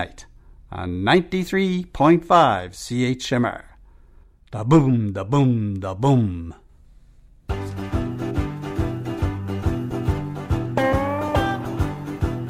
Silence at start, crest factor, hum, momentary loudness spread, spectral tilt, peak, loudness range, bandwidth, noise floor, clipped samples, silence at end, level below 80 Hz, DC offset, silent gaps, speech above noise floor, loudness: 0 s; 20 dB; none; 13 LU; -7 dB/octave; -2 dBFS; 7 LU; 15 kHz; -50 dBFS; under 0.1%; 0 s; -36 dBFS; under 0.1%; none; 30 dB; -22 LUFS